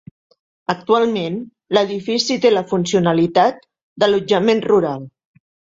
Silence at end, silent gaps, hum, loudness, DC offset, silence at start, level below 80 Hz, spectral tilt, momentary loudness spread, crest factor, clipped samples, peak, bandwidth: 0.7 s; 3.83-3.96 s; none; -17 LUFS; under 0.1%; 0.7 s; -58 dBFS; -5 dB/octave; 9 LU; 16 dB; under 0.1%; -2 dBFS; 7.8 kHz